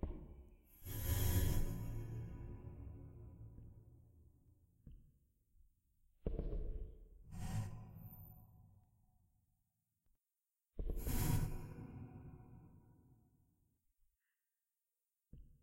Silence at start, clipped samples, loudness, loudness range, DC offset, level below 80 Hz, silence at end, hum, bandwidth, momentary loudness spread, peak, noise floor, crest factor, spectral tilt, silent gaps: 0 s; under 0.1%; -45 LUFS; 17 LU; under 0.1%; -48 dBFS; 0.1 s; none; 16 kHz; 25 LU; -24 dBFS; under -90 dBFS; 22 dB; -5.5 dB/octave; none